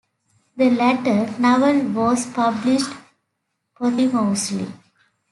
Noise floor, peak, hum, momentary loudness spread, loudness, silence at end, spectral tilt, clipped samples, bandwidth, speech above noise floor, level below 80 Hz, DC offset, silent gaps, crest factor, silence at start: -76 dBFS; -4 dBFS; none; 10 LU; -19 LUFS; 0.55 s; -5 dB/octave; under 0.1%; 12 kHz; 57 dB; -64 dBFS; under 0.1%; none; 16 dB; 0.55 s